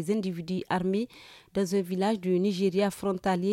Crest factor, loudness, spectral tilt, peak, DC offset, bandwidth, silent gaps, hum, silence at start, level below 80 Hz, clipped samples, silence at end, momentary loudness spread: 14 dB; -29 LUFS; -6.5 dB/octave; -14 dBFS; under 0.1%; 15.5 kHz; none; none; 0 s; -62 dBFS; under 0.1%; 0 s; 6 LU